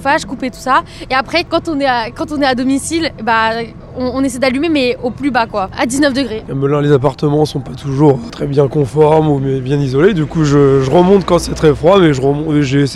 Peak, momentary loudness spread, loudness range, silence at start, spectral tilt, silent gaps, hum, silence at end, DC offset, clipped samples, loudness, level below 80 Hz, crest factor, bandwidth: 0 dBFS; 8 LU; 4 LU; 0 s; -6 dB/octave; none; none; 0 s; under 0.1%; under 0.1%; -13 LUFS; -36 dBFS; 12 dB; 13 kHz